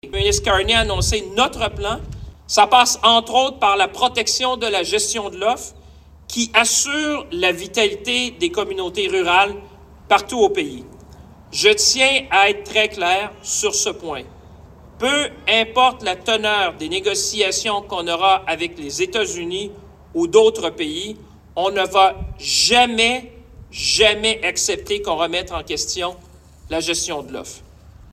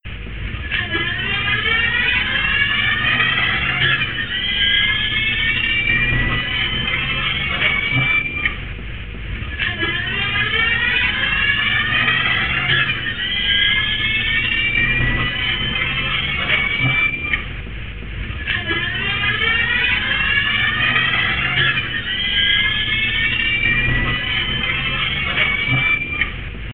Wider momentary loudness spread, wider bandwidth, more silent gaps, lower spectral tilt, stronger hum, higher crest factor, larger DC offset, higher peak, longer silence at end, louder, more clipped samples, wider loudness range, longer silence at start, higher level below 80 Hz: first, 13 LU vs 7 LU; first, 15.5 kHz vs 4.9 kHz; neither; second, -2 dB/octave vs -8.5 dB/octave; neither; about the same, 18 dB vs 16 dB; second, under 0.1% vs 1%; about the same, 0 dBFS vs -2 dBFS; about the same, 0.1 s vs 0 s; about the same, -17 LUFS vs -16 LUFS; neither; about the same, 4 LU vs 3 LU; about the same, 0.05 s vs 0 s; second, -40 dBFS vs -32 dBFS